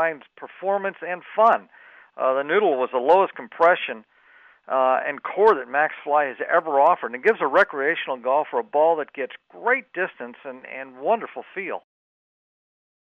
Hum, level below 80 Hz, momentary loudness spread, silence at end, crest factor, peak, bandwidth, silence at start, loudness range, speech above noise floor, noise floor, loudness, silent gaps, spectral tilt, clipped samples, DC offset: none; -74 dBFS; 14 LU; 1.3 s; 18 dB; -6 dBFS; 6.6 kHz; 0 s; 7 LU; 32 dB; -54 dBFS; -22 LUFS; none; -6 dB/octave; under 0.1%; under 0.1%